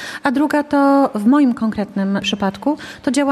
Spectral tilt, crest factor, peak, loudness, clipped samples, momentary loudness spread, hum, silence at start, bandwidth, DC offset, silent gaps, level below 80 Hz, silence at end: -5.5 dB/octave; 14 dB; -4 dBFS; -17 LUFS; under 0.1%; 7 LU; none; 0 s; 13.5 kHz; under 0.1%; none; -52 dBFS; 0 s